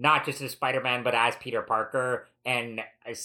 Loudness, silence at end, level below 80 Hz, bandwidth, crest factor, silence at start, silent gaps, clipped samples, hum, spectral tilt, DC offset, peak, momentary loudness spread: -28 LUFS; 0 s; -74 dBFS; 17 kHz; 20 dB; 0 s; none; under 0.1%; none; -3.5 dB/octave; under 0.1%; -8 dBFS; 9 LU